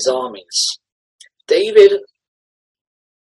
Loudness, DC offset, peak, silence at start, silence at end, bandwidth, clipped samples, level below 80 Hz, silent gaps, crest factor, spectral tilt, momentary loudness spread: -14 LUFS; under 0.1%; 0 dBFS; 0 s; 1.2 s; 12 kHz; 0.1%; -66 dBFS; 0.92-1.19 s; 18 dB; -1.5 dB/octave; 13 LU